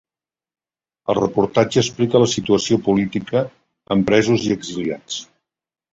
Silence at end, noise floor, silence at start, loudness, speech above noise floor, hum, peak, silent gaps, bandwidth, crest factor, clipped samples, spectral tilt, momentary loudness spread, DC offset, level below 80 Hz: 0.7 s; under -90 dBFS; 1.1 s; -19 LUFS; over 72 dB; none; -2 dBFS; none; 8 kHz; 18 dB; under 0.1%; -5 dB/octave; 11 LU; under 0.1%; -52 dBFS